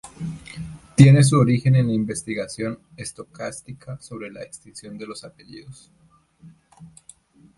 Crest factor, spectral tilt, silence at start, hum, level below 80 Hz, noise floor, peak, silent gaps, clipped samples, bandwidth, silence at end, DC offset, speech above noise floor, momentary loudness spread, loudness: 22 dB; -6.5 dB/octave; 0.05 s; none; -52 dBFS; -51 dBFS; 0 dBFS; none; under 0.1%; 11.5 kHz; 0.7 s; under 0.1%; 30 dB; 24 LU; -18 LUFS